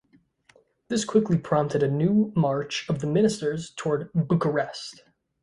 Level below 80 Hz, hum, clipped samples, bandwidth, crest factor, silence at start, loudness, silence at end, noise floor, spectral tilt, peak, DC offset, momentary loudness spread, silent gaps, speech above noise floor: -60 dBFS; none; under 0.1%; 11.5 kHz; 18 dB; 0.9 s; -25 LUFS; 0.5 s; -61 dBFS; -6.5 dB/octave; -8 dBFS; under 0.1%; 8 LU; none; 37 dB